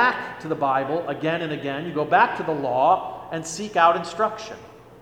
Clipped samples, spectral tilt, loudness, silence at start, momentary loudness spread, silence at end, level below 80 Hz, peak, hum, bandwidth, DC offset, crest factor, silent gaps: under 0.1%; -4.5 dB/octave; -23 LUFS; 0 s; 12 LU; 0 s; -60 dBFS; -4 dBFS; none; 12.5 kHz; under 0.1%; 18 dB; none